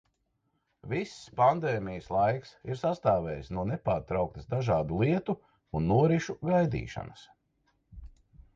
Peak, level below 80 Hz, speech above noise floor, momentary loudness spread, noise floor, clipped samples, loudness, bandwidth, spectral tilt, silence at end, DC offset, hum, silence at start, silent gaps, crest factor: -10 dBFS; -52 dBFS; 48 dB; 12 LU; -77 dBFS; under 0.1%; -30 LUFS; 7.8 kHz; -7.5 dB/octave; 0.15 s; under 0.1%; none; 0.85 s; none; 20 dB